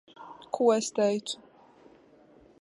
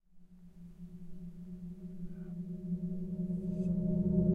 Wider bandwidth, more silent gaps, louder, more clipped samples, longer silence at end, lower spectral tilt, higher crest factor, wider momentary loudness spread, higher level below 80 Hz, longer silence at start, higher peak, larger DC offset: first, 11.5 kHz vs 1.6 kHz; neither; first, -28 LUFS vs -37 LUFS; neither; first, 1.25 s vs 0 s; second, -4 dB/octave vs -12 dB/octave; about the same, 20 dB vs 18 dB; about the same, 21 LU vs 19 LU; second, -76 dBFS vs -52 dBFS; about the same, 0.2 s vs 0.15 s; first, -10 dBFS vs -18 dBFS; neither